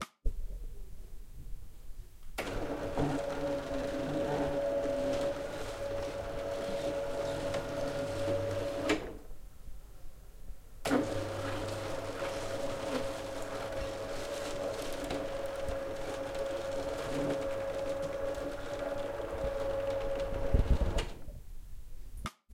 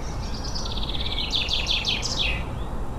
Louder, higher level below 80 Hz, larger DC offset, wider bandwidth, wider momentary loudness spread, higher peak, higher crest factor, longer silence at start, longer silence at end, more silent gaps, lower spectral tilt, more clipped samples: second, -36 LUFS vs -25 LUFS; second, -42 dBFS vs -32 dBFS; neither; first, 16.5 kHz vs 14 kHz; first, 20 LU vs 9 LU; second, -14 dBFS vs -10 dBFS; about the same, 20 dB vs 16 dB; about the same, 0 s vs 0 s; about the same, 0 s vs 0 s; neither; first, -5.5 dB/octave vs -3 dB/octave; neither